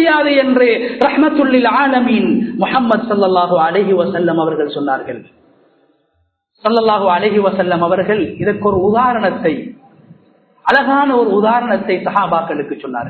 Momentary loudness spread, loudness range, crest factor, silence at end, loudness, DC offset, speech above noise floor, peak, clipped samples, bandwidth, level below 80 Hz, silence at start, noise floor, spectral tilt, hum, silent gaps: 7 LU; 4 LU; 14 dB; 0 s; -14 LUFS; under 0.1%; 50 dB; 0 dBFS; under 0.1%; 4.6 kHz; -50 dBFS; 0 s; -64 dBFS; -8 dB/octave; none; none